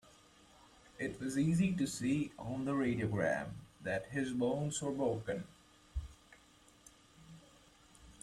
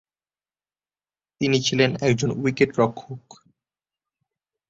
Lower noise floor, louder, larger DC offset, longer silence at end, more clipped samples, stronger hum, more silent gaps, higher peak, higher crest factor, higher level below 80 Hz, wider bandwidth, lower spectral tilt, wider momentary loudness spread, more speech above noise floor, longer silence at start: second, -64 dBFS vs under -90 dBFS; second, -37 LUFS vs -22 LUFS; neither; second, 0 s vs 1.5 s; neither; second, none vs 50 Hz at -55 dBFS; neither; second, -20 dBFS vs -4 dBFS; about the same, 18 dB vs 20 dB; about the same, -58 dBFS vs -58 dBFS; first, 14 kHz vs 7.8 kHz; about the same, -6 dB/octave vs -5 dB/octave; about the same, 17 LU vs 18 LU; second, 29 dB vs over 68 dB; second, 1 s vs 1.4 s